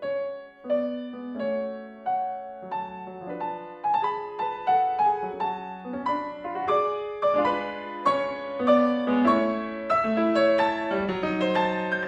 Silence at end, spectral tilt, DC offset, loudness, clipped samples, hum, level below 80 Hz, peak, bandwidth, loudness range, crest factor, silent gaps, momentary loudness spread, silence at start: 0 s; -6.5 dB/octave; under 0.1%; -26 LUFS; under 0.1%; none; -62 dBFS; -8 dBFS; 8.8 kHz; 8 LU; 18 dB; none; 13 LU; 0 s